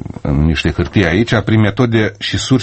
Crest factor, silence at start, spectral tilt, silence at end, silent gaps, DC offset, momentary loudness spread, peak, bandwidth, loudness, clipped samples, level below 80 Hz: 14 dB; 0 s; -6 dB/octave; 0 s; none; under 0.1%; 4 LU; 0 dBFS; 8.8 kHz; -14 LUFS; under 0.1%; -28 dBFS